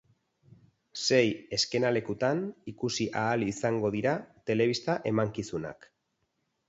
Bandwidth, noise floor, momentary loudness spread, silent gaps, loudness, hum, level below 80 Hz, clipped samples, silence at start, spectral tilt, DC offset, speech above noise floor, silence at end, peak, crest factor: 8 kHz; -78 dBFS; 10 LU; none; -29 LUFS; none; -64 dBFS; under 0.1%; 0.95 s; -4.5 dB/octave; under 0.1%; 49 dB; 0.95 s; -10 dBFS; 20 dB